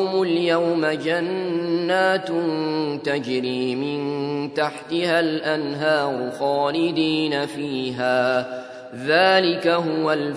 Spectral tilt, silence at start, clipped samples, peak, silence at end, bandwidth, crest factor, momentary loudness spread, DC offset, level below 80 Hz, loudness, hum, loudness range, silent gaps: -5.5 dB/octave; 0 s; under 0.1%; -2 dBFS; 0 s; 11 kHz; 20 dB; 6 LU; under 0.1%; -70 dBFS; -22 LUFS; none; 3 LU; none